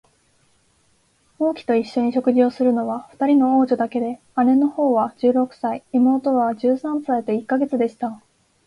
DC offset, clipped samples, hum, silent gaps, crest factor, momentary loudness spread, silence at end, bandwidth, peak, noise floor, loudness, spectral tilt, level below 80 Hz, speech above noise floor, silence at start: under 0.1%; under 0.1%; none; none; 14 dB; 7 LU; 0.5 s; 9.8 kHz; -6 dBFS; -62 dBFS; -20 LUFS; -7.5 dB/octave; -64 dBFS; 42 dB; 1.4 s